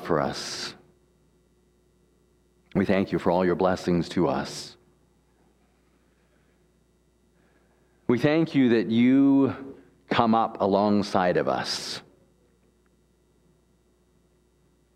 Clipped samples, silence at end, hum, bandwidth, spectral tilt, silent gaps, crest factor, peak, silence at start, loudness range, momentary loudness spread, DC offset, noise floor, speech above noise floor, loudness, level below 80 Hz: under 0.1%; 2.95 s; none; 12.5 kHz; -6 dB/octave; none; 24 dB; -4 dBFS; 0 s; 11 LU; 14 LU; under 0.1%; -65 dBFS; 41 dB; -24 LUFS; -60 dBFS